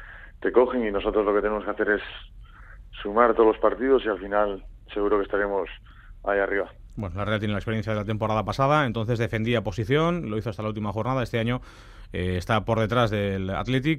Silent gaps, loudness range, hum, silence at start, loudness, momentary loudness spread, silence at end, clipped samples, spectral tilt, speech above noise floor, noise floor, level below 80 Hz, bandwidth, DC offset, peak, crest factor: none; 4 LU; none; 0 s; -25 LUFS; 13 LU; 0 s; under 0.1%; -7 dB/octave; 21 dB; -45 dBFS; -44 dBFS; 13.5 kHz; under 0.1%; -4 dBFS; 20 dB